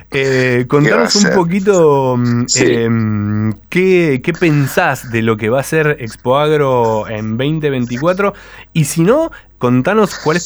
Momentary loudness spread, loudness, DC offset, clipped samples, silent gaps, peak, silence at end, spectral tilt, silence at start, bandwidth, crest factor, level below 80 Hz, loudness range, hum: 7 LU; -13 LUFS; under 0.1%; under 0.1%; none; 0 dBFS; 0 s; -5.5 dB/octave; 0 s; over 20 kHz; 12 dB; -44 dBFS; 3 LU; none